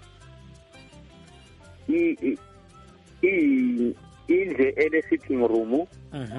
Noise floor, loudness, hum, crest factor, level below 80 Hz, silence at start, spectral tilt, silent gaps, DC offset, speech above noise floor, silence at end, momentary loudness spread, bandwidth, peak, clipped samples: -50 dBFS; -24 LUFS; none; 16 dB; -56 dBFS; 0.75 s; -7.5 dB/octave; none; under 0.1%; 27 dB; 0 s; 14 LU; 10.5 kHz; -10 dBFS; under 0.1%